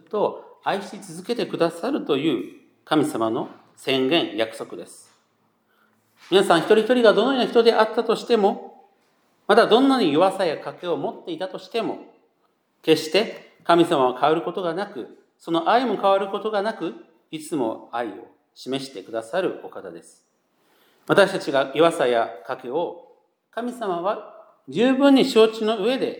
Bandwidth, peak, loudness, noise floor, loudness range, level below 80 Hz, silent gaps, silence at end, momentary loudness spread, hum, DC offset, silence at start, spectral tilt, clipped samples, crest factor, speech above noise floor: 19.5 kHz; -2 dBFS; -21 LUFS; -67 dBFS; 7 LU; -82 dBFS; none; 0 s; 16 LU; none; under 0.1%; 0.15 s; -5 dB/octave; under 0.1%; 22 dB; 46 dB